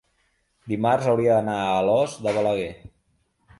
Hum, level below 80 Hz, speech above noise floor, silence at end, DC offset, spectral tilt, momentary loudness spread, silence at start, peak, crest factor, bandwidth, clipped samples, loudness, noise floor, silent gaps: none; -56 dBFS; 47 dB; 0.7 s; under 0.1%; -6.5 dB/octave; 8 LU; 0.65 s; -8 dBFS; 16 dB; 11.5 kHz; under 0.1%; -22 LUFS; -68 dBFS; none